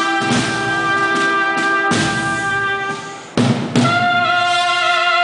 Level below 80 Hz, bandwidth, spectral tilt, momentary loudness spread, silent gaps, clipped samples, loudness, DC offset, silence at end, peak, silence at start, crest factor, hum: -50 dBFS; 10.5 kHz; -4 dB/octave; 5 LU; none; under 0.1%; -16 LUFS; under 0.1%; 0 s; -2 dBFS; 0 s; 14 dB; none